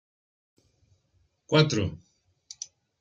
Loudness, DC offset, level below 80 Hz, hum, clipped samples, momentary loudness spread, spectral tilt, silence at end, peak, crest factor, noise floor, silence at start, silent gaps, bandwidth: -25 LUFS; under 0.1%; -62 dBFS; none; under 0.1%; 24 LU; -5 dB/octave; 1.05 s; -6 dBFS; 24 dB; -70 dBFS; 1.5 s; none; 7.8 kHz